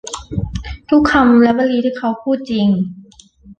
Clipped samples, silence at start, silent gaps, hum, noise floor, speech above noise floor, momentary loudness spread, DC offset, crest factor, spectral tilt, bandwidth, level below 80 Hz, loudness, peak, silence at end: under 0.1%; 0.05 s; none; none; -43 dBFS; 30 dB; 14 LU; under 0.1%; 14 dB; -6 dB/octave; 9.2 kHz; -36 dBFS; -15 LUFS; -2 dBFS; 0.05 s